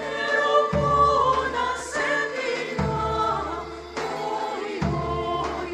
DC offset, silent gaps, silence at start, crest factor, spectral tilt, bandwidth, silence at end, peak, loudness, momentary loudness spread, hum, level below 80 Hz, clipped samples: under 0.1%; none; 0 s; 16 dB; -5 dB/octave; 14.5 kHz; 0 s; -8 dBFS; -24 LUFS; 10 LU; none; -42 dBFS; under 0.1%